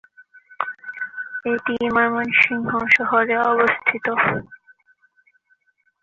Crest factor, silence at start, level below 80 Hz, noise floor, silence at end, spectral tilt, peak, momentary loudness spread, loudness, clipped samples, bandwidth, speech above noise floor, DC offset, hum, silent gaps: 20 dB; 0.2 s; -60 dBFS; -64 dBFS; 1.45 s; -6 dB/octave; -2 dBFS; 13 LU; -19 LUFS; under 0.1%; 7.4 kHz; 45 dB; under 0.1%; none; none